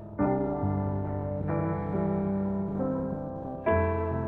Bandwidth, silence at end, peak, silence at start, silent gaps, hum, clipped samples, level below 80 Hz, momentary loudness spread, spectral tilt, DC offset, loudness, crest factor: 3.7 kHz; 0 s; -14 dBFS; 0 s; none; none; under 0.1%; -46 dBFS; 6 LU; -12 dB/octave; under 0.1%; -30 LUFS; 16 dB